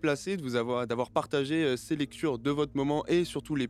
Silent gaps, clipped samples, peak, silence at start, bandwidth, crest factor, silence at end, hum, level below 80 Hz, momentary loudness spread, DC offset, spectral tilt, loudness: none; under 0.1%; -12 dBFS; 0 s; 14.5 kHz; 18 dB; 0 s; none; -58 dBFS; 4 LU; under 0.1%; -5.5 dB/octave; -30 LUFS